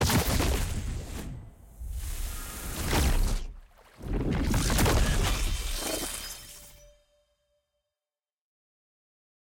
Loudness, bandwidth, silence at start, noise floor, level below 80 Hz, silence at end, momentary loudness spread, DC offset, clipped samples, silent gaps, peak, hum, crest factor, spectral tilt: -30 LUFS; 17 kHz; 0 s; under -90 dBFS; -32 dBFS; 2.65 s; 20 LU; under 0.1%; under 0.1%; none; -14 dBFS; none; 16 dB; -4 dB/octave